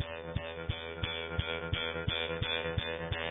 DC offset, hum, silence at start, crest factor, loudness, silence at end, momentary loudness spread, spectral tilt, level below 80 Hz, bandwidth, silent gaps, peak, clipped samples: under 0.1%; none; 0 s; 18 dB; -35 LUFS; 0 s; 6 LU; -8 dB/octave; -46 dBFS; 3.9 kHz; none; -18 dBFS; under 0.1%